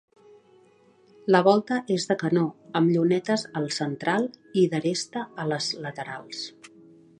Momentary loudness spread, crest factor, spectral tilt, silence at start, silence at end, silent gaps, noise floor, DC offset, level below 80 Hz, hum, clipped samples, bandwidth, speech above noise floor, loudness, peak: 14 LU; 22 dB; -5.5 dB/octave; 1.25 s; 0.5 s; none; -58 dBFS; under 0.1%; -74 dBFS; none; under 0.1%; 10.5 kHz; 34 dB; -25 LUFS; -4 dBFS